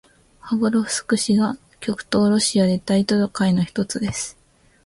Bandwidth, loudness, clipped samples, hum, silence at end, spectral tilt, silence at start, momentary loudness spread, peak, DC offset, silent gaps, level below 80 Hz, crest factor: 11.5 kHz; -20 LUFS; under 0.1%; none; 0.55 s; -5 dB/octave; 0.45 s; 11 LU; -2 dBFS; under 0.1%; none; -52 dBFS; 18 dB